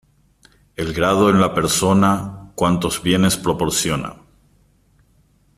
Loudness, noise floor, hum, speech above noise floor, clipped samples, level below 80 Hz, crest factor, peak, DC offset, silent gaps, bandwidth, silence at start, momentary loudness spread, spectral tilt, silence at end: -18 LUFS; -57 dBFS; none; 40 dB; under 0.1%; -44 dBFS; 16 dB; -2 dBFS; under 0.1%; none; 15 kHz; 0.8 s; 12 LU; -4.5 dB/octave; 1.45 s